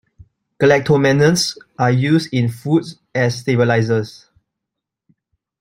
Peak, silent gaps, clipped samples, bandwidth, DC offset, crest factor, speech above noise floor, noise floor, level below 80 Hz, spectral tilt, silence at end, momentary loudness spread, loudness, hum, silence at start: 0 dBFS; none; under 0.1%; 16 kHz; under 0.1%; 16 dB; 66 dB; -82 dBFS; -54 dBFS; -5.5 dB/octave; 1.5 s; 7 LU; -16 LUFS; none; 0.6 s